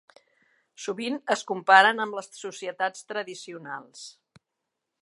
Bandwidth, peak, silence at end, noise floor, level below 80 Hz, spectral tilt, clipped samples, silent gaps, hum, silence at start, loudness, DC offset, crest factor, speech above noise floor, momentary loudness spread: 11.5 kHz; -2 dBFS; 0.95 s; -84 dBFS; -86 dBFS; -2.5 dB/octave; under 0.1%; none; none; 0.8 s; -24 LUFS; under 0.1%; 24 dB; 58 dB; 22 LU